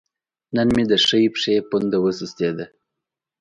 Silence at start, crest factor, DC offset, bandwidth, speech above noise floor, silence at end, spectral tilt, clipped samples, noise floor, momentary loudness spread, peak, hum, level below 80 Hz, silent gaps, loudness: 0.5 s; 16 dB; under 0.1%; 11 kHz; 65 dB; 0.75 s; -5 dB/octave; under 0.1%; -84 dBFS; 10 LU; -6 dBFS; none; -50 dBFS; none; -19 LUFS